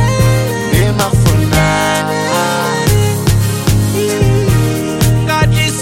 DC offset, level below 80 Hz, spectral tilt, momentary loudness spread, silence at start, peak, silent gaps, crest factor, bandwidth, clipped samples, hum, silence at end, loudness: under 0.1%; -24 dBFS; -5 dB/octave; 3 LU; 0 s; 0 dBFS; none; 12 dB; 17 kHz; under 0.1%; none; 0 s; -12 LUFS